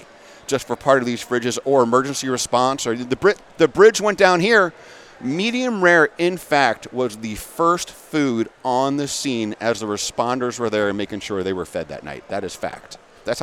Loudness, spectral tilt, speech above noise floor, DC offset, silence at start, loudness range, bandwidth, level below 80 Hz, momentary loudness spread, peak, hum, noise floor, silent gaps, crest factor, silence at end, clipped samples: -19 LUFS; -4 dB/octave; 20 dB; under 0.1%; 0 s; 7 LU; 16 kHz; -54 dBFS; 14 LU; 0 dBFS; none; -40 dBFS; none; 20 dB; 0 s; under 0.1%